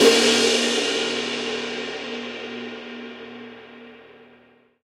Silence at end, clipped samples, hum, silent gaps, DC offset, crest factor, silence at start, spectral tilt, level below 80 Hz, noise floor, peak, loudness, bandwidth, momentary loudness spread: 0.6 s; under 0.1%; none; none; under 0.1%; 22 dB; 0 s; -1 dB/octave; -68 dBFS; -55 dBFS; -2 dBFS; -22 LUFS; 15.5 kHz; 24 LU